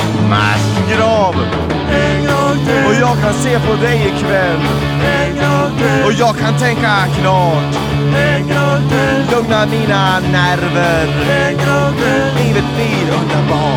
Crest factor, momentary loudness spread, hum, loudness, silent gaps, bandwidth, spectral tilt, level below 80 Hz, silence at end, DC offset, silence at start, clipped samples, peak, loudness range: 12 dB; 3 LU; none; -13 LUFS; none; 16 kHz; -6 dB/octave; -32 dBFS; 0 s; under 0.1%; 0 s; under 0.1%; 0 dBFS; 0 LU